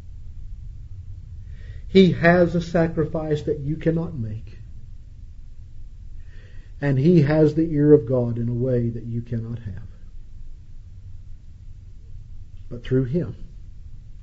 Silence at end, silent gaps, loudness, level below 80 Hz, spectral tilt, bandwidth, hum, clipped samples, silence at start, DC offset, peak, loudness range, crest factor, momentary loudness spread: 0 s; none; -21 LUFS; -38 dBFS; -8.5 dB/octave; 7.6 kHz; none; under 0.1%; 0 s; under 0.1%; -2 dBFS; 13 LU; 22 dB; 27 LU